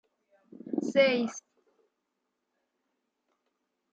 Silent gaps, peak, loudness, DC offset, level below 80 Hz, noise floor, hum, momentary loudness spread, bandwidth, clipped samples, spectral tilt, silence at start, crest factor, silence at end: none; -12 dBFS; -28 LUFS; under 0.1%; -84 dBFS; -82 dBFS; none; 13 LU; 8 kHz; under 0.1%; -4 dB/octave; 0.65 s; 22 dB; 2.55 s